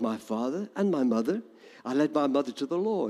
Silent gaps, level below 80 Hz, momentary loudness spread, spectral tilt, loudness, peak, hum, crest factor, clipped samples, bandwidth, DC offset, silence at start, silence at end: none; -82 dBFS; 6 LU; -6.5 dB/octave; -29 LUFS; -14 dBFS; none; 14 dB; under 0.1%; 13 kHz; under 0.1%; 0 s; 0 s